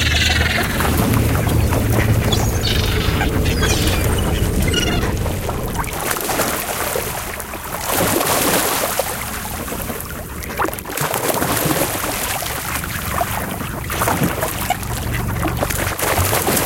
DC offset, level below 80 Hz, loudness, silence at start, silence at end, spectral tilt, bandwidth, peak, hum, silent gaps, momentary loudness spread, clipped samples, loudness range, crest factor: under 0.1%; -26 dBFS; -19 LUFS; 0 s; 0 s; -4 dB/octave; 17.5 kHz; 0 dBFS; none; none; 8 LU; under 0.1%; 4 LU; 18 dB